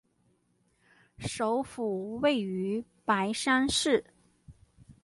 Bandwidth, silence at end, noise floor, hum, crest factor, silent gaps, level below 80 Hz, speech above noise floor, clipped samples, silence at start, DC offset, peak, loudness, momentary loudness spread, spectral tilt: 11.5 kHz; 0.1 s; -71 dBFS; none; 20 dB; none; -60 dBFS; 42 dB; under 0.1%; 1.2 s; under 0.1%; -12 dBFS; -29 LUFS; 9 LU; -3.5 dB/octave